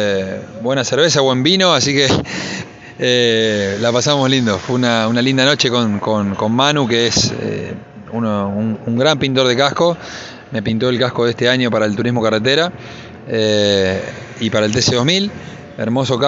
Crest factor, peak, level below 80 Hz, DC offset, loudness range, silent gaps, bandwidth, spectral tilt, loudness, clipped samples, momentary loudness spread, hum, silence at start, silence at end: 16 dB; 0 dBFS; -48 dBFS; under 0.1%; 3 LU; none; 8 kHz; -4 dB/octave; -15 LUFS; under 0.1%; 13 LU; none; 0 s; 0 s